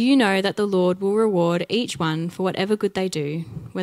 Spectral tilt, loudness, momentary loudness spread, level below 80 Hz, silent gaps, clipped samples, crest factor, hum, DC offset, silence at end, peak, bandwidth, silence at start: -6 dB/octave; -22 LUFS; 7 LU; -62 dBFS; none; under 0.1%; 18 dB; none; under 0.1%; 0 s; -4 dBFS; 14.5 kHz; 0 s